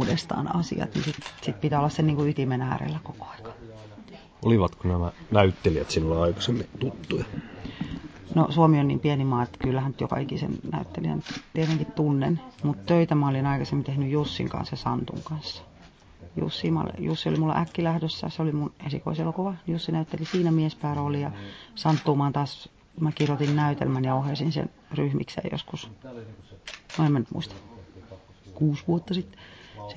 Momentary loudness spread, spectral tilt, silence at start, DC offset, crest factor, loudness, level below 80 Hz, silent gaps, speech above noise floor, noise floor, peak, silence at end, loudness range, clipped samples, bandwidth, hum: 17 LU; -7.5 dB/octave; 0 s; under 0.1%; 22 dB; -27 LUFS; -46 dBFS; none; 25 dB; -52 dBFS; -4 dBFS; 0 s; 5 LU; under 0.1%; 8 kHz; none